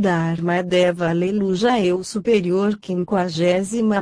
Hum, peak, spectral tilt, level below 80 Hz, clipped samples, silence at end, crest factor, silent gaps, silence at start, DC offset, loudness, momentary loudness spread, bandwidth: none; -6 dBFS; -6 dB/octave; -54 dBFS; under 0.1%; 0 s; 14 dB; none; 0 s; under 0.1%; -20 LUFS; 4 LU; 10.5 kHz